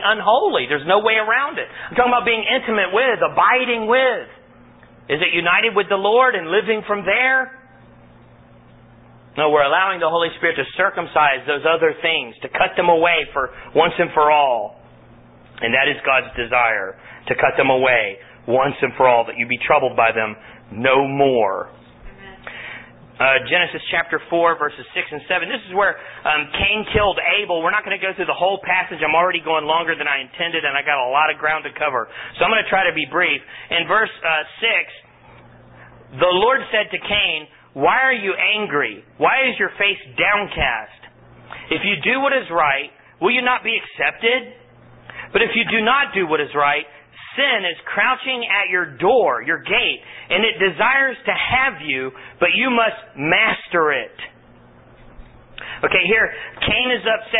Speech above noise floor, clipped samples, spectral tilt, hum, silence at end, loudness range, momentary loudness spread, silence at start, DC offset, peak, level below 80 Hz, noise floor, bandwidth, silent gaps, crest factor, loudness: 29 dB; under 0.1%; -9 dB/octave; none; 0 s; 3 LU; 9 LU; 0 s; under 0.1%; -2 dBFS; -48 dBFS; -47 dBFS; 4 kHz; none; 18 dB; -17 LUFS